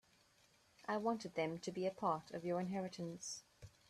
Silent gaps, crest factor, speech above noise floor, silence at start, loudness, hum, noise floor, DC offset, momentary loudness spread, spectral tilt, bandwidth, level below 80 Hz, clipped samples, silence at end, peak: none; 18 dB; 31 dB; 0.8 s; -43 LUFS; none; -73 dBFS; under 0.1%; 9 LU; -5 dB/octave; 13.5 kHz; -78 dBFS; under 0.1%; 0.2 s; -26 dBFS